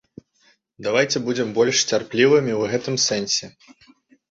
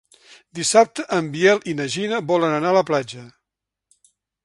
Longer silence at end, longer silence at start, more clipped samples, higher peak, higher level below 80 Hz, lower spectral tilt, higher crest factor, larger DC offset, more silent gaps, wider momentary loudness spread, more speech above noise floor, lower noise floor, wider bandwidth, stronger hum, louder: second, 0.8 s vs 1.15 s; first, 0.8 s vs 0.55 s; neither; about the same, -4 dBFS vs -2 dBFS; about the same, -62 dBFS vs -66 dBFS; about the same, -3 dB/octave vs -4 dB/octave; about the same, 18 dB vs 20 dB; neither; neither; second, 7 LU vs 10 LU; second, 41 dB vs 65 dB; second, -61 dBFS vs -84 dBFS; second, 8 kHz vs 11.5 kHz; neither; about the same, -20 LUFS vs -19 LUFS